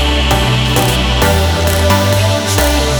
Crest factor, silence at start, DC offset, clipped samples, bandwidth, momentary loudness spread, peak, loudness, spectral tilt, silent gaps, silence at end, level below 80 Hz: 12 dB; 0 s; under 0.1%; under 0.1%; over 20 kHz; 1 LU; 0 dBFS; -12 LUFS; -4.5 dB/octave; none; 0 s; -18 dBFS